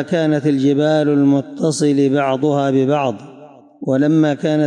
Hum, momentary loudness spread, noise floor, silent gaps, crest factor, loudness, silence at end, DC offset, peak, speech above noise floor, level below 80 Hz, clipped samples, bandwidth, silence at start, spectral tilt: none; 6 LU; -41 dBFS; none; 10 dB; -16 LUFS; 0 s; under 0.1%; -6 dBFS; 26 dB; -70 dBFS; under 0.1%; 11 kHz; 0 s; -6.5 dB/octave